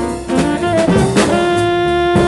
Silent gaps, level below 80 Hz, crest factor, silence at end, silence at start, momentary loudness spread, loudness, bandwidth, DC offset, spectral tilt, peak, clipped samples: none; -32 dBFS; 14 dB; 0 s; 0 s; 4 LU; -14 LUFS; 12 kHz; under 0.1%; -5.5 dB/octave; 0 dBFS; under 0.1%